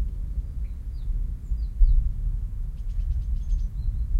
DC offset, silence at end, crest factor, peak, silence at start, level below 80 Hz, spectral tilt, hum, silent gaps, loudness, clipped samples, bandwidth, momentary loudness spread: under 0.1%; 0 s; 18 dB; -6 dBFS; 0 s; -24 dBFS; -8.5 dB/octave; none; none; -31 LUFS; under 0.1%; 1.1 kHz; 10 LU